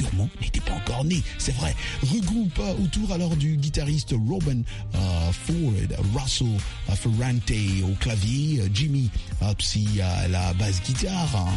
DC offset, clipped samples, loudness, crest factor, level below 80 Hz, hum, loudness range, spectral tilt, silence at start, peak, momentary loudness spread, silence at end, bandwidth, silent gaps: under 0.1%; under 0.1%; -25 LUFS; 10 dB; -32 dBFS; none; 1 LU; -5.5 dB/octave; 0 s; -14 dBFS; 4 LU; 0 s; 11.5 kHz; none